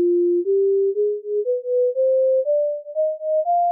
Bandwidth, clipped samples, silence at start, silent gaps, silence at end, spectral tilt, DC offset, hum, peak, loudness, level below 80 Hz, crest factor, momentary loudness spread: 0.8 kHz; under 0.1%; 0 s; none; 0 s; 12 dB/octave; under 0.1%; none; -14 dBFS; -20 LUFS; under -90 dBFS; 6 dB; 5 LU